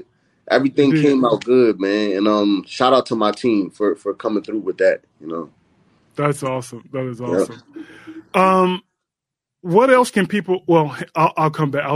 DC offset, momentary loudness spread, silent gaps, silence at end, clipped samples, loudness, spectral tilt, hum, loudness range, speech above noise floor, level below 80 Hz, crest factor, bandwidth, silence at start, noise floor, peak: under 0.1%; 15 LU; none; 0 s; under 0.1%; -18 LUFS; -6 dB/octave; none; 7 LU; 67 dB; -64 dBFS; 18 dB; 15 kHz; 0.45 s; -84 dBFS; 0 dBFS